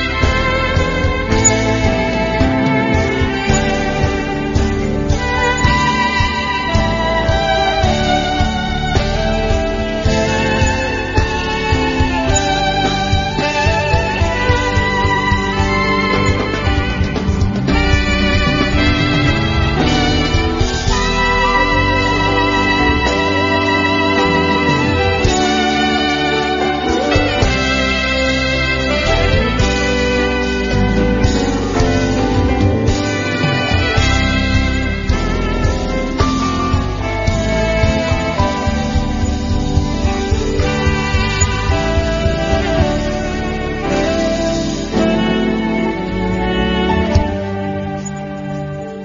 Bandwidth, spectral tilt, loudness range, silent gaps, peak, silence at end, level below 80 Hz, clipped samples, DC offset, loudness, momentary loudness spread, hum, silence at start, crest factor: 7.6 kHz; -5 dB/octave; 3 LU; none; 0 dBFS; 0 s; -22 dBFS; under 0.1%; under 0.1%; -15 LUFS; 4 LU; none; 0 s; 14 dB